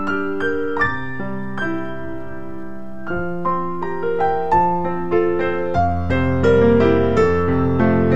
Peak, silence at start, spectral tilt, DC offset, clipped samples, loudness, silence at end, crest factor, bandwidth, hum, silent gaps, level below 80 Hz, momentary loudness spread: -2 dBFS; 0 s; -8.5 dB/octave; 5%; under 0.1%; -19 LUFS; 0 s; 16 dB; 8 kHz; none; none; -38 dBFS; 16 LU